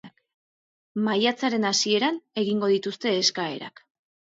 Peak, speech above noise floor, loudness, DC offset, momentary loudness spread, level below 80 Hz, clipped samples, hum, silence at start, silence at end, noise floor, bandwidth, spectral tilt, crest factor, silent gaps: -6 dBFS; over 66 dB; -24 LUFS; under 0.1%; 10 LU; -74 dBFS; under 0.1%; none; 0.05 s; 0.65 s; under -90 dBFS; 7.8 kHz; -3 dB/octave; 20 dB; 0.34-0.95 s